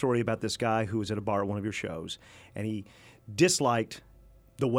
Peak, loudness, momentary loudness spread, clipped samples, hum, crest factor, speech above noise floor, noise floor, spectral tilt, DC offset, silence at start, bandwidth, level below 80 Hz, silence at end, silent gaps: -10 dBFS; -30 LUFS; 15 LU; under 0.1%; none; 20 dB; 26 dB; -56 dBFS; -4.5 dB/octave; under 0.1%; 0 s; 16.5 kHz; -60 dBFS; 0 s; none